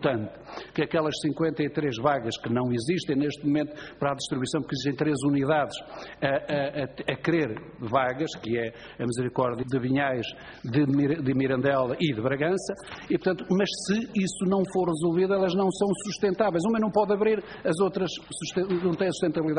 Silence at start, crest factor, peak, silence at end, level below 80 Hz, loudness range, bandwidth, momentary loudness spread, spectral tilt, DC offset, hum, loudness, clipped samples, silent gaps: 0 s; 18 dB; -8 dBFS; 0 s; -58 dBFS; 3 LU; 10 kHz; 7 LU; -6 dB/octave; under 0.1%; none; -27 LUFS; under 0.1%; none